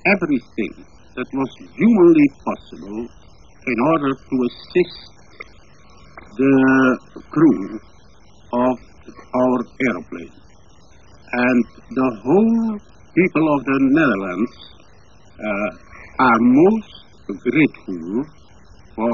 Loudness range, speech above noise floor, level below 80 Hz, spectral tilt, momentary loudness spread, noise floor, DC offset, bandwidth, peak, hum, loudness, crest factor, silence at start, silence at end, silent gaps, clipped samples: 5 LU; 32 dB; -52 dBFS; -8 dB/octave; 19 LU; -49 dBFS; 0.5%; 7 kHz; -2 dBFS; none; -18 LUFS; 16 dB; 0.05 s; 0 s; none; under 0.1%